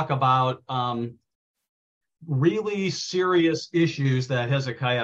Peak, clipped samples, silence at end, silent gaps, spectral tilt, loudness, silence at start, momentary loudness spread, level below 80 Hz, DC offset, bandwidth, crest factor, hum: -8 dBFS; under 0.1%; 0 s; 1.35-1.54 s, 1.69-2.01 s; -6 dB/octave; -24 LUFS; 0 s; 7 LU; -66 dBFS; under 0.1%; 7.8 kHz; 16 dB; none